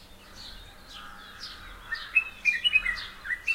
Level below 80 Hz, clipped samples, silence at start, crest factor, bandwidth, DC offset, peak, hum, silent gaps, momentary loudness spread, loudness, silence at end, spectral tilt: -52 dBFS; under 0.1%; 0 s; 20 dB; 16 kHz; under 0.1%; -12 dBFS; none; none; 22 LU; -26 LUFS; 0 s; -0.5 dB/octave